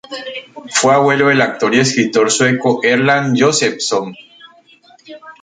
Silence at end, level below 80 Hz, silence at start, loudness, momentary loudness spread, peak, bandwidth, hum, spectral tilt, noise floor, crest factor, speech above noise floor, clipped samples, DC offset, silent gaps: 0.1 s; -58 dBFS; 0.1 s; -13 LUFS; 15 LU; 0 dBFS; 9.6 kHz; none; -3.5 dB/octave; -47 dBFS; 14 dB; 33 dB; under 0.1%; under 0.1%; none